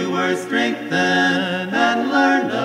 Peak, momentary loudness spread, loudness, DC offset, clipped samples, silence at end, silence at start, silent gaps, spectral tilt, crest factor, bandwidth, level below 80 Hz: -4 dBFS; 4 LU; -18 LUFS; under 0.1%; under 0.1%; 0 s; 0 s; none; -4.5 dB/octave; 14 dB; 15 kHz; -68 dBFS